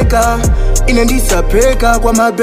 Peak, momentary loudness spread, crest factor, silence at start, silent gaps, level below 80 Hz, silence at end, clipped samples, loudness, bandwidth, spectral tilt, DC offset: 0 dBFS; 3 LU; 10 dB; 0 s; none; -12 dBFS; 0 s; under 0.1%; -11 LUFS; 16 kHz; -5 dB/octave; under 0.1%